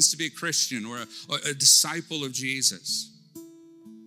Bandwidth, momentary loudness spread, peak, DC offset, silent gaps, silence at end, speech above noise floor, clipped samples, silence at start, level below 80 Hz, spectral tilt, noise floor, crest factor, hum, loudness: 19 kHz; 17 LU; -6 dBFS; under 0.1%; none; 0 s; 23 dB; under 0.1%; 0 s; -80 dBFS; -0.5 dB/octave; -49 dBFS; 20 dB; none; -23 LUFS